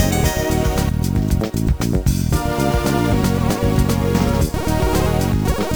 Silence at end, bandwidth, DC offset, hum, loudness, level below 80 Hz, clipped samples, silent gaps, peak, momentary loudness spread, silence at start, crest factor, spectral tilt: 0 s; over 20 kHz; under 0.1%; none; -18 LUFS; -24 dBFS; under 0.1%; none; -2 dBFS; 2 LU; 0 s; 14 dB; -6 dB/octave